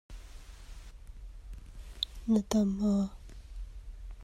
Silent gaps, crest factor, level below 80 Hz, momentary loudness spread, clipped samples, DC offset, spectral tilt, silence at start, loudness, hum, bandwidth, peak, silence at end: none; 22 dB; -46 dBFS; 24 LU; under 0.1%; under 0.1%; -6 dB/octave; 0.1 s; -31 LUFS; none; 13.5 kHz; -12 dBFS; 0 s